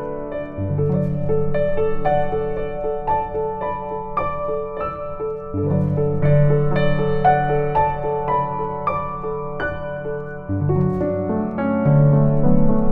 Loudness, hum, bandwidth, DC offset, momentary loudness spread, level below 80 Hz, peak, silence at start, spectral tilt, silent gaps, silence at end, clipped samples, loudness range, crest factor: -21 LUFS; none; 4.5 kHz; under 0.1%; 10 LU; -34 dBFS; -4 dBFS; 0 s; -11 dB/octave; none; 0 s; under 0.1%; 4 LU; 16 dB